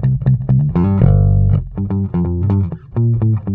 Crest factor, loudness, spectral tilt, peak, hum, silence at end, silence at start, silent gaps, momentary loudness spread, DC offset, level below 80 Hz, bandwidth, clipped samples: 14 dB; -15 LUFS; -13 dB/octave; 0 dBFS; none; 0 s; 0 s; none; 6 LU; under 0.1%; -24 dBFS; 3 kHz; under 0.1%